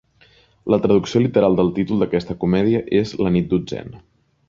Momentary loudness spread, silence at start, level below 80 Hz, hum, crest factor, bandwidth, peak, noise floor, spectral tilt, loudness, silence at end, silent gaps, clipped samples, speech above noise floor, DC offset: 10 LU; 0.65 s; -46 dBFS; none; 16 dB; 7.4 kHz; -2 dBFS; -54 dBFS; -7.5 dB/octave; -19 LUFS; 0.5 s; none; under 0.1%; 36 dB; under 0.1%